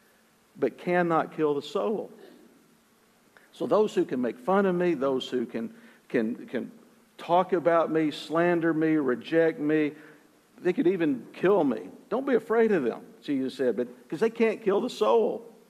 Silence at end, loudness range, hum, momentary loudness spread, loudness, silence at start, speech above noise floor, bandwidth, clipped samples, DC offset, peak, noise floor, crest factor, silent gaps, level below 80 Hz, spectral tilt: 0.2 s; 4 LU; none; 10 LU; -27 LUFS; 0.55 s; 36 dB; 14 kHz; under 0.1%; under 0.1%; -10 dBFS; -62 dBFS; 18 dB; none; -78 dBFS; -7 dB/octave